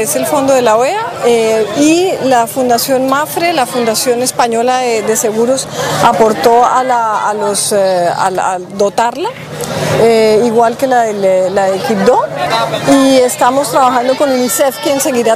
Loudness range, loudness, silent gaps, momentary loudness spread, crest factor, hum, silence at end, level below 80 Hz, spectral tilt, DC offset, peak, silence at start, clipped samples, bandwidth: 2 LU; -11 LUFS; none; 5 LU; 10 dB; none; 0 s; -50 dBFS; -3.5 dB/octave; under 0.1%; 0 dBFS; 0 s; 0.2%; 16 kHz